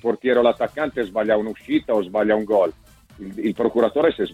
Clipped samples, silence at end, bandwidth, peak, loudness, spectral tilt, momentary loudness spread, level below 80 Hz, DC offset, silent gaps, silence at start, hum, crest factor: under 0.1%; 0 s; 13.5 kHz; -4 dBFS; -21 LUFS; -7 dB/octave; 7 LU; -54 dBFS; under 0.1%; none; 0.05 s; none; 16 dB